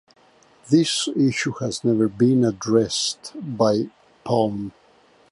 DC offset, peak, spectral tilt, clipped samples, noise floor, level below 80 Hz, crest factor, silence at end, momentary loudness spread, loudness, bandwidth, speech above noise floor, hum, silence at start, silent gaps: under 0.1%; -4 dBFS; -5 dB/octave; under 0.1%; -56 dBFS; -60 dBFS; 18 dB; 0.6 s; 14 LU; -21 LUFS; 11.5 kHz; 35 dB; none; 0.65 s; none